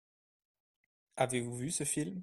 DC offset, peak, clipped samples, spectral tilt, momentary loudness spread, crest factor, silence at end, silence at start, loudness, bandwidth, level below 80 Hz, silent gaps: under 0.1%; -16 dBFS; under 0.1%; -4 dB/octave; 3 LU; 22 dB; 0 s; 1.15 s; -35 LUFS; 14.5 kHz; -72 dBFS; none